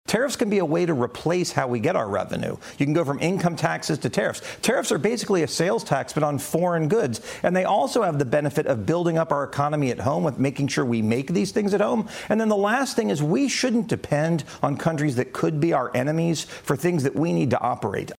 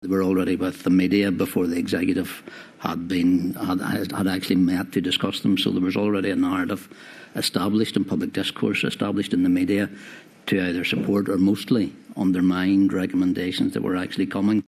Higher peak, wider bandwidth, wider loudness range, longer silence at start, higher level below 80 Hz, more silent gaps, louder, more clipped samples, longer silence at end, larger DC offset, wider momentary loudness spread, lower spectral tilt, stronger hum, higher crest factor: about the same, -4 dBFS vs -4 dBFS; first, 16 kHz vs 14 kHz; about the same, 1 LU vs 2 LU; about the same, 0.1 s vs 0 s; about the same, -58 dBFS vs -60 dBFS; neither; about the same, -23 LUFS vs -23 LUFS; neither; about the same, 0.05 s vs 0.05 s; neither; second, 4 LU vs 9 LU; about the same, -5.5 dB/octave vs -6 dB/octave; neither; about the same, 20 dB vs 18 dB